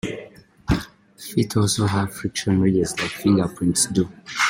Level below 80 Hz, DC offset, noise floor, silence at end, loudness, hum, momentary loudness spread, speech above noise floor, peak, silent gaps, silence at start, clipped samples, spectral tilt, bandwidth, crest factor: -42 dBFS; under 0.1%; -44 dBFS; 0 s; -22 LUFS; none; 13 LU; 23 dB; -6 dBFS; none; 0.05 s; under 0.1%; -4.5 dB/octave; 16.5 kHz; 16 dB